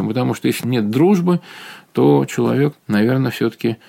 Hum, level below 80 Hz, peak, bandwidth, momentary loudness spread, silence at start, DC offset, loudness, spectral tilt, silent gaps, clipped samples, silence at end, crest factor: none; -64 dBFS; -2 dBFS; 17 kHz; 7 LU; 0 s; under 0.1%; -17 LUFS; -7 dB/octave; none; under 0.1%; 0.15 s; 14 dB